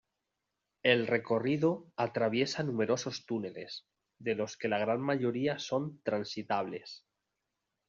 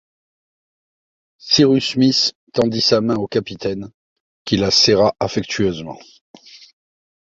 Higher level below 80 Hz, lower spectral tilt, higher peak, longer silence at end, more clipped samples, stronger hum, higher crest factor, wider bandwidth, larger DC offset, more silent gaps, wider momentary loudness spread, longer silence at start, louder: second, -76 dBFS vs -50 dBFS; about the same, -4 dB/octave vs -4.5 dB/octave; second, -12 dBFS vs -2 dBFS; about the same, 0.9 s vs 0.8 s; neither; neither; about the same, 20 dB vs 18 dB; about the same, 7.4 kHz vs 7.8 kHz; neither; second, none vs 2.35-2.47 s, 3.94-4.45 s, 6.21-6.34 s; second, 12 LU vs 15 LU; second, 0.85 s vs 1.45 s; second, -33 LUFS vs -16 LUFS